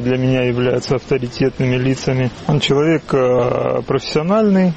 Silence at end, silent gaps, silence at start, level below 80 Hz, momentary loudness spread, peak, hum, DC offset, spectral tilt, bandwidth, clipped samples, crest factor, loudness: 0 s; none; 0 s; -42 dBFS; 5 LU; -2 dBFS; none; 0.3%; -6.5 dB/octave; 8.4 kHz; under 0.1%; 12 dB; -16 LUFS